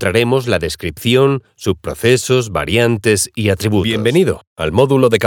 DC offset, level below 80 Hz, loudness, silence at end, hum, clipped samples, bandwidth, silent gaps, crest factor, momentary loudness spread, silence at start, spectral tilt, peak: under 0.1%; -40 dBFS; -15 LUFS; 0 s; none; under 0.1%; 19 kHz; 4.47-4.56 s; 14 dB; 8 LU; 0 s; -5 dB/octave; 0 dBFS